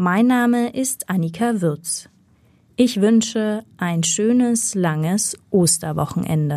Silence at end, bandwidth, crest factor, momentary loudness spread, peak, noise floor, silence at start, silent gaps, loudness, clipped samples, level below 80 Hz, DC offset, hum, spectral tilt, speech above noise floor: 0 s; 15 kHz; 16 dB; 8 LU; -4 dBFS; -55 dBFS; 0 s; none; -19 LUFS; under 0.1%; -58 dBFS; under 0.1%; none; -4.5 dB/octave; 37 dB